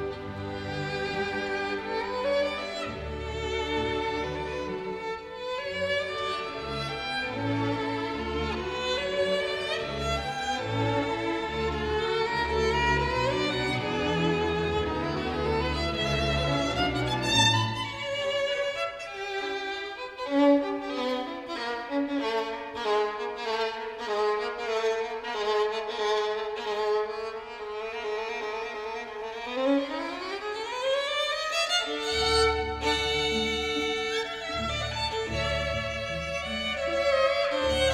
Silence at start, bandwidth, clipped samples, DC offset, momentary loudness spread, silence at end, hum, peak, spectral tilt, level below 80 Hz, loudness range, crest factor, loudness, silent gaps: 0 s; 14.5 kHz; under 0.1%; under 0.1%; 9 LU; 0 s; none; -10 dBFS; -4.5 dB/octave; -44 dBFS; 5 LU; 18 dB; -28 LUFS; none